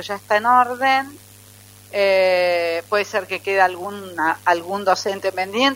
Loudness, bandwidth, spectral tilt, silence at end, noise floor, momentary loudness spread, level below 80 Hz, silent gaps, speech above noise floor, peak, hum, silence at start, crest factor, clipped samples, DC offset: -19 LUFS; 16 kHz; -3 dB/octave; 0 s; -45 dBFS; 8 LU; -66 dBFS; none; 26 dB; -2 dBFS; 50 Hz at -50 dBFS; 0 s; 18 dB; under 0.1%; under 0.1%